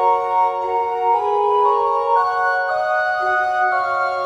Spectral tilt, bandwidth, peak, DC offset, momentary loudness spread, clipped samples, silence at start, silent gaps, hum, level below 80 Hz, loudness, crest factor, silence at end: -3.5 dB/octave; 10.5 kHz; -6 dBFS; under 0.1%; 3 LU; under 0.1%; 0 s; none; none; -60 dBFS; -18 LUFS; 12 dB; 0 s